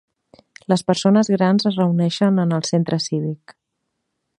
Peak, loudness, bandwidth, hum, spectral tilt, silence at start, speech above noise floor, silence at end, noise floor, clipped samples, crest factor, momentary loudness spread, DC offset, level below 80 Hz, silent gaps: -2 dBFS; -19 LUFS; 11 kHz; none; -6 dB/octave; 0.7 s; 58 dB; 0.85 s; -76 dBFS; under 0.1%; 18 dB; 9 LU; under 0.1%; -66 dBFS; none